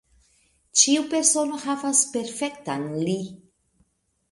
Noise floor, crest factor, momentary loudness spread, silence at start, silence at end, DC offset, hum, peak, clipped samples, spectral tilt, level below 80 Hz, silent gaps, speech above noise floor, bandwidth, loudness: -69 dBFS; 24 dB; 12 LU; 0.75 s; 0.95 s; under 0.1%; none; -2 dBFS; under 0.1%; -2.5 dB/octave; -68 dBFS; none; 46 dB; 11.5 kHz; -22 LUFS